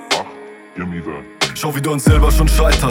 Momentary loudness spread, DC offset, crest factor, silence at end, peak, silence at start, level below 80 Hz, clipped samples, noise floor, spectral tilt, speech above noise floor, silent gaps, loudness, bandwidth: 18 LU; under 0.1%; 14 dB; 0 s; -2 dBFS; 0 s; -18 dBFS; under 0.1%; -35 dBFS; -5 dB/octave; 22 dB; none; -16 LUFS; 16.5 kHz